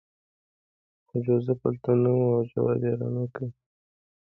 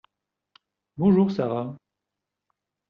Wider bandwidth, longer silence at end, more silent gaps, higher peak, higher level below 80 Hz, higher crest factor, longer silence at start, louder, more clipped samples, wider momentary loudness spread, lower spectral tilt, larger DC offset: second, 3.8 kHz vs 5.8 kHz; second, 0.85 s vs 1.15 s; neither; about the same, -10 dBFS vs -8 dBFS; about the same, -64 dBFS vs -62 dBFS; about the same, 18 dB vs 18 dB; first, 1.15 s vs 0.95 s; second, -26 LUFS vs -23 LUFS; neither; second, 11 LU vs 17 LU; first, -12.5 dB/octave vs -9 dB/octave; neither